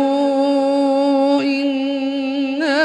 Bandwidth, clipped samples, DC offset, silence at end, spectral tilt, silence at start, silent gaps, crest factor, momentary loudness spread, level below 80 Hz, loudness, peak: 9.8 kHz; under 0.1%; under 0.1%; 0 s; -4 dB/octave; 0 s; none; 12 dB; 5 LU; -68 dBFS; -17 LUFS; -4 dBFS